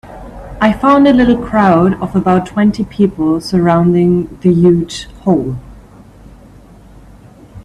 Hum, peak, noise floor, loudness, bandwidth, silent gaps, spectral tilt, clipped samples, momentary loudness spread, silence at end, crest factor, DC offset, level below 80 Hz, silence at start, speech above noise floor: none; 0 dBFS; -39 dBFS; -12 LUFS; 11 kHz; none; -7.5 dB/octave; under 0.1%; 12 LU; 0.05 s; 12 dB; under 0.1%; -36 dBFS; 0.05 s; 28 dB